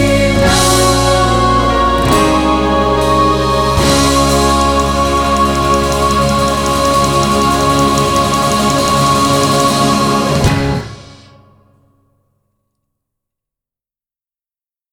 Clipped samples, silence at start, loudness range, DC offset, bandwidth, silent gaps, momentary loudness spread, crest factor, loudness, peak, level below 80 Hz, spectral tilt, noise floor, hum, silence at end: under 0.1%; 0 s; 5 LU; under 0.1%; 20 kHz; none; 3 LU; 12 dB; -11 LUFS; 0 dBFS; -24 dBFS; -4.5 dB/octave; under -90 dBFS; none; 3.8 s